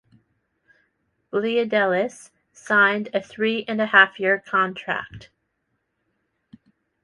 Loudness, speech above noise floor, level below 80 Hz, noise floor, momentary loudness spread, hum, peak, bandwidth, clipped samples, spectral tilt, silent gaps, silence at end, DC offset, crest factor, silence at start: -21 LUFS; 53 dB; -66 dBFS; -75 dBFS; 13 LU; none; -2 dBFS; 11.5 kHz; under 0.1%; -4.5 dB/octave; none; 1.85 s; under 0.1%; 22 dB; 1.35 s